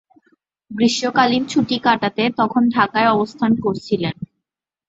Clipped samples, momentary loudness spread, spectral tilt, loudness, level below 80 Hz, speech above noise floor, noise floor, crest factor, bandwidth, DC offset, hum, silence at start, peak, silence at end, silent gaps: under 0.1%; 7 LU; -5 dB/octave; -18 LUFS; -58 dBFS; 65 dB; -83 dBFS; 18 dB; 8 kHz; under 0.1%; none; 0.7 s; -2 dBFS; 0.65 s; none